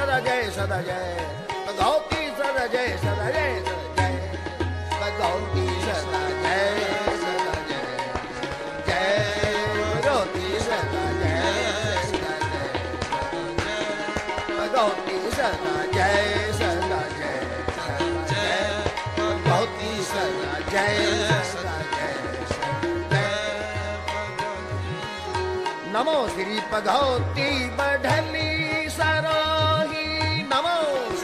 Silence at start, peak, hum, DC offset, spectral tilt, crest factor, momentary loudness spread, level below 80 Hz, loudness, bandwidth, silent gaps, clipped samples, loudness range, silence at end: 0 s; -8 dBFS; none; under 0.1%; -4.5 dB/octave; 16 dB; 7 LU; -42 dBFS; -25 LUFS; 14 kHz; none; under 0.1%; 3 LU; 0 s